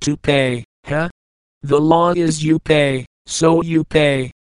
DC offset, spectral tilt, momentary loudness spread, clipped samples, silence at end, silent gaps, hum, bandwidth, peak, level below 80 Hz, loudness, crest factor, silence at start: 0.5%; -5.5 dB/octave; 11 LU; under 0.1%; 0.2 s; 0.65-0.83 s, 1.11-1.61 s, 3.07-3.25 s; none; 11 kHz; 0 dBFS; -44 dBFS; -16 LUFS; 16 dB; 0 s